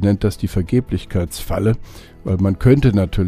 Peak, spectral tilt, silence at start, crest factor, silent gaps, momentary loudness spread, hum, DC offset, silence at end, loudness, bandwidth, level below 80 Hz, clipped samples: 0 dBFS; -7.5 dB/octave; 0 s; 16 dB; none; 10 LU; none; under 0.1%; 0 s; -18 LUFS; 15.5 kHz; -30 dBFS; under 0.1%